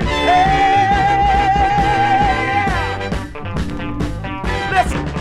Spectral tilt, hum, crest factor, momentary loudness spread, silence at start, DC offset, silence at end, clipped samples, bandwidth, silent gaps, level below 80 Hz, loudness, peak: -5.5 dB/octave; none; 14 dB; 11 LU; 0 s; under 0.1%; 0 s; under 0.1%; 12.5 kHz; none; -26 dBFS; -16 LUFS; -2 dBFS